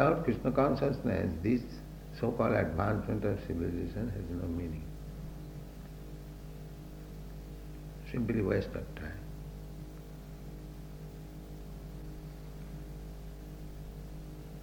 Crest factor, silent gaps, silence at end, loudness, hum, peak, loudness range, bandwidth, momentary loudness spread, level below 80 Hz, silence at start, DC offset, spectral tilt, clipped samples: 24 dB; none; 0 s; -35 LUFS; none; -10 dBFS; 14 LU; 19.5 kHz; 17 LU; -46 dBFS; 0 s; under 0.1%; -8 dB/octave; under 0.1%